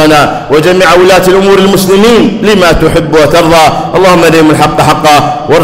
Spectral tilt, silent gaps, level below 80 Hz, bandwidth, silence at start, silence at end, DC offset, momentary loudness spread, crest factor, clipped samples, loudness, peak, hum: -5 dB/octave; none; -26 dBFS; 16.5 kHz; 0 s; 0 s; under 0.1%; 3 LU; 4 dB; 0.3%; -4 LUFS; 0 dBFS; none